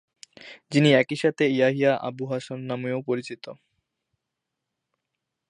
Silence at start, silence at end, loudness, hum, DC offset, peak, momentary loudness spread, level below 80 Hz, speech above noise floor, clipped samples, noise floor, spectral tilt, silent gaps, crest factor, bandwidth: 0.4 s; 1.95 s; -24 LUFS; none; under 0.1%; -4 dBFS; 18 LU; -76 dBFS; 60 dB; under 0.1%; -84 dBFS; -6 dB/octave; none; 22 dB; 11 kHz